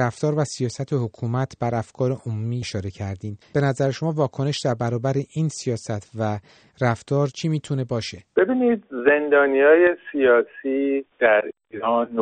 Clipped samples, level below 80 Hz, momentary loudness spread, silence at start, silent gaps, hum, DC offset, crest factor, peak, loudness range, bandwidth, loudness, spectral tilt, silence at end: under 0.1%; -60 dBFS; 11 LU; 0 s; none; none; under 0.1%; 18 dB; -4 dBFS; 7 LU; 9.4 kHz; -22 LUFS; -6.5 dB/octave; 0 s